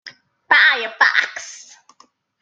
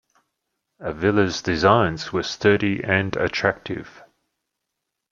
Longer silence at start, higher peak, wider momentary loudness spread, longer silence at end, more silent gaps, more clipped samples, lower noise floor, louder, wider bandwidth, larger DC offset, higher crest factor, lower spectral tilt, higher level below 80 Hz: second, 0.05 s vs 0.8 s; about the same, -2 dBFS vs -2 dBFS; first, 19 LU vs 14 LU; second, 0.85 s vs 1.2 s; neither; neither; second, -55 dBFS vs -81 dBFS; first, -15 LUFS vs -21 LUFS; first, 9 kHz vs 7.4 kHz; neither; about the same, 18 dB vs 20 dB; second, 1.5 dB/octave vs -5.5 dB/octave; second, -72 dBFS vs -52 dBFS